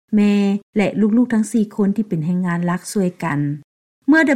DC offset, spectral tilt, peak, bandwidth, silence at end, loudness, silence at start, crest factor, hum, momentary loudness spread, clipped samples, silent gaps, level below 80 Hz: under 0.1%; -6.5 dB/octave; -4 dBFS; 13.5 kHz; 0 s; -18 LUFS; 0.1 s; 14 dB; none; 6 LU; under 0.1%; 0.63-0.73 s, 3.64-4.02 s; -58 dBFS